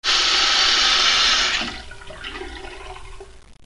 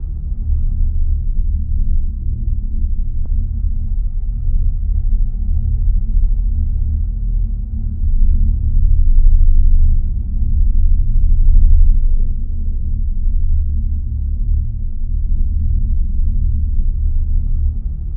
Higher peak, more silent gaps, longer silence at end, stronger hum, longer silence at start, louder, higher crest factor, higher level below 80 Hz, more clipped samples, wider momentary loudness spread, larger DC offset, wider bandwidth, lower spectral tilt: second, -4 dBFS vs 0 dBFS; neither; about the same, 0 s vs 0 s; neither; about the same, 0.05 s vs 0 s; first, -15 LUFS vs -20 LUFS; first, 18 dB vs 12 dB; second, -42 dBFS vs -12 dBFS; neither; first, 22 LU vs 7 LU; first, 0.2% vs under 0.1%; first, 11.5 kHz vs 0.5 kHz; second, 0.5 dB/octave vs -14 dB/octave